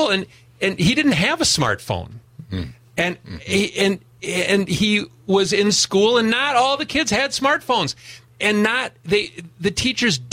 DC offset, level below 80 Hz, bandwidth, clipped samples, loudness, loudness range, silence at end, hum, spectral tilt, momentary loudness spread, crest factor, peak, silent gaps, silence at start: under 0.1%; -48 dBFS; 16 kHz; under 0.1%; -19 LUFS; 4 LU; 0 s; none; -3.5 dB/octave; 12 LU; 14 dB; -6 dBFS; none; 0 s